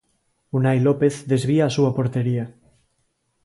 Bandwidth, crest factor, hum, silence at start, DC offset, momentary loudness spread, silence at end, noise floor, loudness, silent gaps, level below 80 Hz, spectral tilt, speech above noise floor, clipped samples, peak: 11.5 kHz; 16 dB; none; 0.55 s; under 0.1%; 9 LU; 0.95 s; -70 dBFS; -21 LUFS; none; -58 dBFS; -7.5 dB/octave; 50 dB; under 0.1%; -6 dBFS